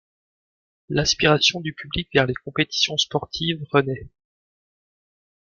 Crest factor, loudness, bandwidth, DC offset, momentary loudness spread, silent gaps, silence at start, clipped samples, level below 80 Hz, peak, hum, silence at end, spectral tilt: 22 dB; -21 LUFS; 7.4 kHz; under 0.1%; 12 LU; none; 0.9 s; under 0.1%; -48 dBFS; -2 dBFS; none; 1.4 s; -3.5 dB/octave